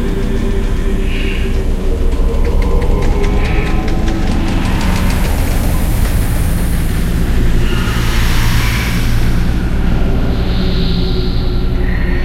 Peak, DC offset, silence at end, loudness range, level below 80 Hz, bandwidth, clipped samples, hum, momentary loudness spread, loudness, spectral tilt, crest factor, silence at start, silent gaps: 0 dBFS; under 0.1%; 0 s; 1 LU; -14 dBFS; 16 kHz; under 0.1%; none; 3 LU; -16 LUFS; -6 dB/octave; 10 dB; 0 s; none